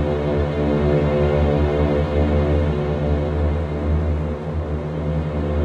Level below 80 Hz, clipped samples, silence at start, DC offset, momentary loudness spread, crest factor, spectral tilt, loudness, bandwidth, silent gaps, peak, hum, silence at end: -26 dBFS; under 0.1%; 0 s; under 0.1%; 6 LU; 12 dB; -9 dB/octave; -20 LUFS; 6.4 kHz; none; -6 dBFS; none; 0 s